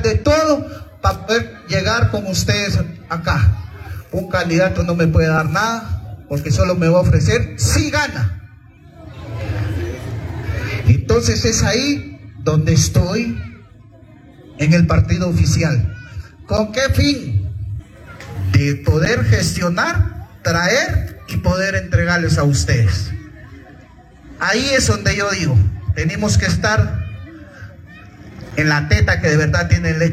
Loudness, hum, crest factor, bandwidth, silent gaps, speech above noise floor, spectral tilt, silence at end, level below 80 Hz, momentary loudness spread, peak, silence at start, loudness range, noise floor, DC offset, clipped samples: -17 LUFS; none; 16 dB; 14.5 kHz; none; 27 dB; -5 dB/octave; 0 s; -32 dBFS; 14 LU; -2 dBFS; 0 s; 3 LU; -42 dBFS; under 0.1%; under 0.1%